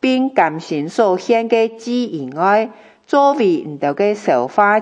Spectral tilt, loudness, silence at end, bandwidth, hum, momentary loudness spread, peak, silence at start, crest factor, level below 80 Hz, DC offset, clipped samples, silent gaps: -5.5 dB/octave; -16 LUFS; 0 s; 9.2 kHz; none; 7 LU; 0 dBFS; 0.05 s; 16 dB; -74 dBFS; under 0.1%; under 0.1%; none